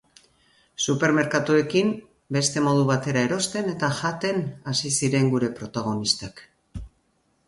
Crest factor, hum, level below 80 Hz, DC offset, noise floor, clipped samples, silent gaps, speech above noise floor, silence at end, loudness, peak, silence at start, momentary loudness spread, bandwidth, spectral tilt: 20 dB; none; -54 dBFS; under 0.1%; -68 dBFS; under 0.1%; none; 44 dB; 0.6 s; -23 LUFS; -6 dBFS; 0.8 s; 14 LU; 11.5 kHz; -4.5 dB/octave